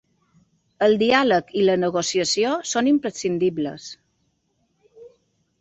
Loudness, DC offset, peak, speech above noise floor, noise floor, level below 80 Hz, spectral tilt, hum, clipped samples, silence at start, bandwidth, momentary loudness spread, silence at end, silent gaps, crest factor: -21 LUFS; under 0.1%; -4 dBFS; 49 dB; -69 dBFS; -62 dBFS; -4 dB/octave; none; under 0.1%; 0.8 s; 8.2 kHz; 11 LU; 0.55 s; none; 20 dB